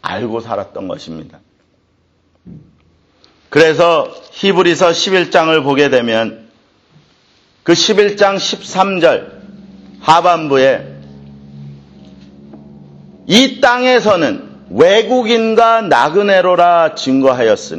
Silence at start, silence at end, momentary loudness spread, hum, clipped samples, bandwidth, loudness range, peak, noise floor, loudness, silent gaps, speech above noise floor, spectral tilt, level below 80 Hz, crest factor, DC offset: 0.05 s; 0 s; 13 LU; none; under 0.1%; 10.5 kHz; 6 LU; 0 dBFS; -57 dBFS; -11 LUFS; none; 45 dB; -4 dB/octave; -54 dBFS; 14 dB; under 0.1%